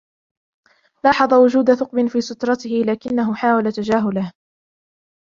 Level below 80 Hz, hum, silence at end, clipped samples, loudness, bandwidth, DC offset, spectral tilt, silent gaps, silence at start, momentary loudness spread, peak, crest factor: -58 dBFS; none; 0.9 s; under 0.1%; -18 LUFS; 7.4 kHz; under 0.1%; -6 dB/octave; none; 1.05 s; 9 LU; 0 dBFS; 18 dB